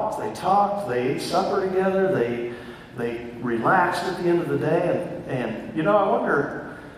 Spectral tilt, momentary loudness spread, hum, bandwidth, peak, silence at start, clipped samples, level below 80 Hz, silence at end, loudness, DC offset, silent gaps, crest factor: -6.5 dB/octave; 10 LU; none; 14.5 kHz; -8 dBFS; 0 s; under 0.1%; -56 dBFS; 0 s; -23 LUFS; under 0.1%; none; 16 dB